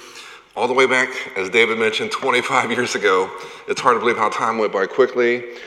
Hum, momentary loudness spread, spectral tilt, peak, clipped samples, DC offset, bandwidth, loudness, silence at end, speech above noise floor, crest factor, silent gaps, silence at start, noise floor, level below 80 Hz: none; 10 LU; -3 dB/octave; 0 dBFS; under 0.1%; under 0.1%; 13 kHz; -18 LUFS; 0 s; 21 dB; 20 dB; none; 0 s; -40 dBFS; -68 dBFS